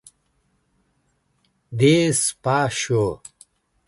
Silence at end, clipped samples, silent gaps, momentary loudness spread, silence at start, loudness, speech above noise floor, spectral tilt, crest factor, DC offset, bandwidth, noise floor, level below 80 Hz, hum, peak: 0.7 s; under 0.1%; none; 12 LU; 1.7 s; -20 LUFS; 48 dB; -4.5 dB/octave; 18 dB; under 0.1%; 12 kHz; -68 dBFS; -54 dBFS; none; -4 dBFS